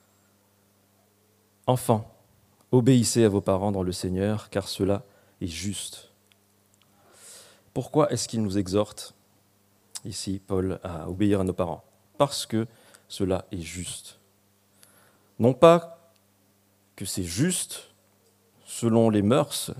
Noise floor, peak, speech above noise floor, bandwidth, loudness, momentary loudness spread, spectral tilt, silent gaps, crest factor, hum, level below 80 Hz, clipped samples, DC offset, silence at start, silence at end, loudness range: -64 dBFS; -2 dBFS; 40 dB; 15.5 kHz; -25 LUFS; 19 LU; -5.5 dB/octave; none; 26 dB; none; -58 dBFS; under 0.1%; under 0.1%; 1.65 s; 0 s; 7 LU